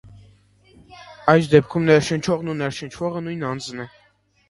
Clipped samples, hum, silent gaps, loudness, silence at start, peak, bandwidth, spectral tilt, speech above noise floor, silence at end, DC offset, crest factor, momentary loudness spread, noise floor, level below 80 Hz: under 0.1%; 50 Hz at -50 dBFS; none; -20 LUFS; 0.05 s; 0 dBFS; 11.5 kHz; -6 dB/octave; 41 dB; 0.6 s; under 0.1%; 22 dB; 14 LU; -60 dBFS; -54 dBFS